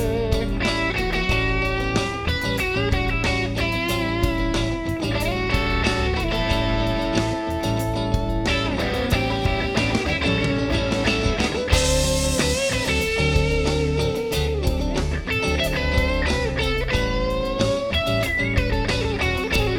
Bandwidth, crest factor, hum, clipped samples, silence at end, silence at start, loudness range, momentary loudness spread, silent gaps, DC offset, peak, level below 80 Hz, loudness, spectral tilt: 18.5 kHz; 18 dB; none; under 0.1%; 0 s; 0 s; 2 LU; 3 LU; none; under 0.1%; -4 dBFS; -28 dBFS; -22 LUFS; -4.5 dB/octave